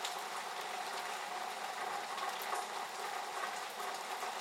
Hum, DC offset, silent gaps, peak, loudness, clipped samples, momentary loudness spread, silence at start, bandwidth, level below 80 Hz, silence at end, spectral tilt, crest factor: none; under 0.1%; none; -22 dBFS; -41 LUFS; under 0.1%; 2 LU; 0 s; 16 kHz; under -90 dBFS; 0 s; 0 dB/octave; 18 dB